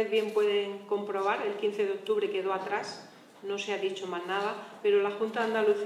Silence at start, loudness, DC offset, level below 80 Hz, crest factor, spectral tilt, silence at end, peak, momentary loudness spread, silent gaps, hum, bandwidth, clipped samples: 0 s; -30 LUFS; under 0.1%; -90 dBFS; 14 dB; -4 dB/octave; 0 s; -16 dBFS; 8 LU; none; none; 12 kHz; under 0.1%